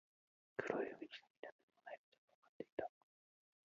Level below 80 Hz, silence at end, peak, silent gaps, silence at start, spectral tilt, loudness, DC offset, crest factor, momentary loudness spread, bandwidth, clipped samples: -88 dBFS; 0.9 s; -24 dBFS; 1.30-1.43 s, 1.52-1.68 s, 1.98-2.12 s, 2.18-2.28 s, 2.34-2.42 s, 2.49-2.60 s, 2.72-2.77 s; 0.6 s; -3 dB/octave; -50 LUFS; under 0.1%; 28 dB; 15 LU; 7.2 kHz; under 0.1%